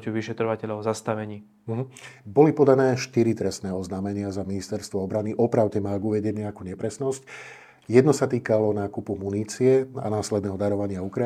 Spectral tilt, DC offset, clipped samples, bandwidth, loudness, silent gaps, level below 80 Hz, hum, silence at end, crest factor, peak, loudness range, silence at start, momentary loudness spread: -6.5 dB/octave; under 0.1%; under 0.1%; 13.5 kHz; -25 LUFS; none; -66 dBFS; none; 0 s; 22 dB; -2 dBFS; 3 LU; 0 s; 13 LU